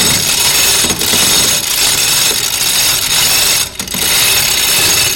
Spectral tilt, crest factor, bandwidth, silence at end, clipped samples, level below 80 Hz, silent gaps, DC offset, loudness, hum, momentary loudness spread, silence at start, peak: 0 dB/octave; 12 dB; 17 kHz; 0 s; under 0.1%; -38 dBFS; none; under 0.1%; -8 LUFS; none; 3 LU; 0 s; 0 dBFS